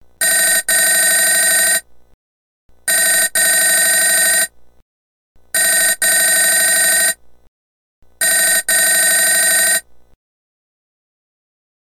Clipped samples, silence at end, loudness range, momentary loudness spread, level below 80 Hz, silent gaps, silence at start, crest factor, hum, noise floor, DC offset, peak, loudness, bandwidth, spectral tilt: under 0.1%; 2.15 s; 1 LU; 6 LU; -58 dBFS; 2.14-2.69 s, 4.82-5.35 s, 7.48-8.02 s; 0.2 s; 14 dB; none; under -90 dBFS; under 0.1%; -2 dBFS; -11 LUFS; 18 kHz; 2 dB/octave